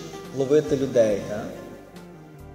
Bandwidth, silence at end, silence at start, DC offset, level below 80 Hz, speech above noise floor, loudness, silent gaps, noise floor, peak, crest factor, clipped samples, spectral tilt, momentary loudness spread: 16 kHz; 0 s; 0 s; under 0.1%; -52 dBFS; 21 dB; -23 LUFS; none; -43 dBFS; -8 dBFS; 18 dB; under 0.1%; -6 dB/octave; 23 LU